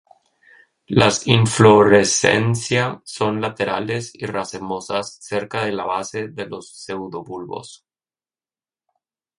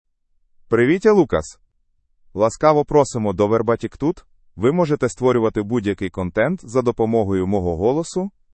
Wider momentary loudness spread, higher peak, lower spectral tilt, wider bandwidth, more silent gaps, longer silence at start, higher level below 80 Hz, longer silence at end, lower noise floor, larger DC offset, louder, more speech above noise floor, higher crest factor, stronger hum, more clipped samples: first, 18 LU vs 9 LU; about the same, 0 dBFS vs -2 dBFS; second, -4.5 dB/octave vs -7 dB/octave; first, 11.5 kHz vs 8.8 kHz; neither; first, 0.9 s vs 0.7 s; second, -52 dBFS vs -46 dBFS; first, 1.65 s vs 0.25 s; first, under -90 dBFS vs -64 dBFS; neither; about the same, -18 LUFS vs -19 LUFS; first, over 71 dB vs 45 dB; about the same, 20 dB vs 18 dB; neither; neither